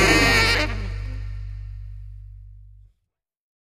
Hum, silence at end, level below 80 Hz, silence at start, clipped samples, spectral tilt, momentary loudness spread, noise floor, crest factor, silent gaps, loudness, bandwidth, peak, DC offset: 50 Hz at -35 dBFS; 1 s; -32 dBFS; 0 s; under 0.1%; -3.5 dB/octave; 26 LU; -78 dBFS; 20 dB; none; -19 LUFS; 14 kHz; -4 dBFS; under 0.1%